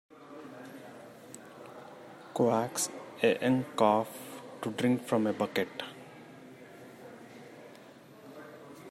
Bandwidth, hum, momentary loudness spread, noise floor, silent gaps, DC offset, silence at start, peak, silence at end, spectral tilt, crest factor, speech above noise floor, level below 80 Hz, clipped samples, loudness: 16 kHz; none; 23 LU; -53 dBFS; none; under 0.1%; 0.2 s; -10 dBFS; 0 s; -4.5 dB/octave; 24 dB; 24 dB; -80 dBFS; under 0.1%; -30 LUFS